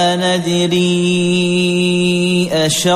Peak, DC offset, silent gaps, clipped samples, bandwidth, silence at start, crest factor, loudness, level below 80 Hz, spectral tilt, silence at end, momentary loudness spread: -2 dBFS; under 0.1%; none; under 0.1%; 15 kHz; 0 s; 10 dB; -14 LUFS; -52 dBFS; -4.5 dB/octave; 0 s; 1 LU